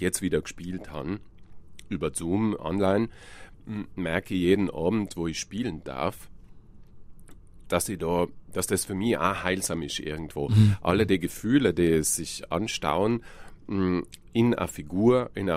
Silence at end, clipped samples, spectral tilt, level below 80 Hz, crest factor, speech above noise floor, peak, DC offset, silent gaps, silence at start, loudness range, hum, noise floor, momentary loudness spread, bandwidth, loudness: 0 s; under 0.1%; -5.5 dB/octave; -48 dBFS; 20 dB; 21 dB; -6 dBFS; under 0.1%; none; 0 s; 7 LU; none; -47 dBFS; 12 LU; 15.5 kHz; -27 LUFS